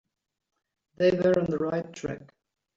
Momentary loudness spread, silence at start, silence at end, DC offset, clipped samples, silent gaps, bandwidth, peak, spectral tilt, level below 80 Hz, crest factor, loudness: 14 LU; 1 s; 0.55 s; under 0.1%; under 0.1%; none; 7.6 kHz; -12 dBFS; -7 dB/octave; -62 dBFS; 18 dB; -27 LUFS